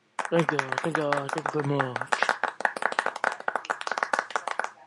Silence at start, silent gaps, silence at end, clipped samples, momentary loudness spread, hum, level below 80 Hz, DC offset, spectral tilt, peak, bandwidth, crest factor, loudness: 0.2 s; none; 0.05 s; under 0.1%; 5 LU; none; -80 dBFS; under 0.1%; -4.5 dB/octave; -6 dBFS; 11.5 kHz; 24 dB; -28 LUFS